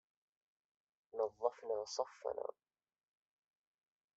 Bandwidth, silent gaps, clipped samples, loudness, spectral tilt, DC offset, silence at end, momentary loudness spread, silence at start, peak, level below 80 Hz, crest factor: 8 kHz; none; under 0.1%; -43 LUFS; -1 dB/octave; under 0.1%; 1.65 s; 8 LU; 1.15 s; -20 dBFS; -88 dBFS; 26 dB